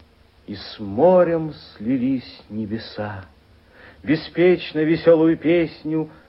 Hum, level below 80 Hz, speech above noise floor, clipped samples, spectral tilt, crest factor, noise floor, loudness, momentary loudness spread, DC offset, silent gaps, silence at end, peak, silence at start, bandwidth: none; -54 dBFS; 30 dB; under 0.1%; -9.5 dB/octave; 18 dB; -49 dBFS; -20 LUFS; 18 LU; under 0.1%; none; 0.2 s; -4 dBFS; 0.5 s; 5.8 kHz